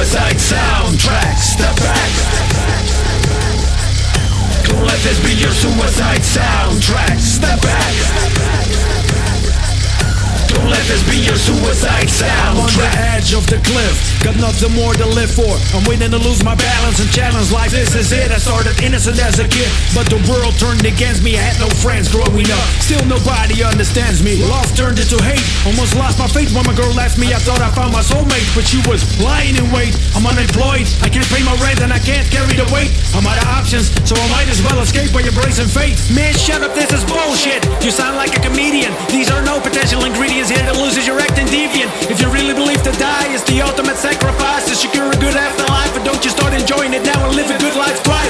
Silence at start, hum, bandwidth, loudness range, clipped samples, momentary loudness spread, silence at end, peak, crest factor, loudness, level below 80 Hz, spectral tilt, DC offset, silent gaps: 0 s; none; 11 kHz; 1 LU; under 0.1%; 2 LU; 0 s; 0 dBFS; 12 dB; -13 LUFS; -16 dBFS; -4 dB/octave; under 0.1%; none